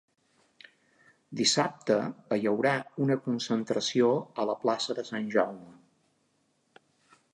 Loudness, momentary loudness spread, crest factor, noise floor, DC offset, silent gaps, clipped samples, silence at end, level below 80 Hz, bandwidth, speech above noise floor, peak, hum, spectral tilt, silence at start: -29 LUFS; 7 LU; 20 dB; -72 dBFS; under 0.1%; none; under 0.1%; 1.6 s; -80 dBFS; 11 kHz; 44 dB; -10 dBFS; none; -4 dB/octave; 1.3 s